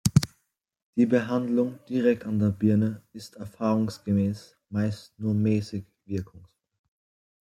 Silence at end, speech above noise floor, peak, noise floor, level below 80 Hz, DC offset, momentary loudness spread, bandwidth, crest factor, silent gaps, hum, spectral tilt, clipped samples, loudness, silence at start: 1.15 s; 51 dB; -4 dBFS; -77 dBFS; -56 dBFS; under 0.1%; 15 LU; 15 kHz; 22 dB; 0.82-0.93 s; none; -7 dB/octave; under 0.1%; -27 LUFS; 0.05 s